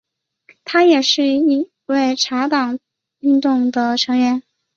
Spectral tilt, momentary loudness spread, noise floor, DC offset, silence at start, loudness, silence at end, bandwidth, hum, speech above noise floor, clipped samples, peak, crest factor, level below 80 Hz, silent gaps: -2.5 dB/octave; 10 LU; -53 dBFS; under 0.1%; 0.65 s; -16 LUFS; 0.35 s; 7.6 kHz; none; 38 dB; under 0.1%; -2 dBFS; 14 dB; -66 dBFS; none